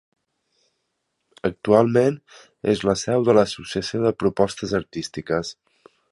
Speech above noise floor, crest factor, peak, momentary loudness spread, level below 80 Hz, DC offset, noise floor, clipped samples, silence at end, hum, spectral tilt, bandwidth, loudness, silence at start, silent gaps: 54 dB; 22 dB; -2 dBFS; 11 LU; -52 dBFS; under 0.1%; -75 dBFS; under 0.1%; 0.6 s; none; -5.5 dB/octave; 11.5 kHz; -22 LUFS; 1.45 s; none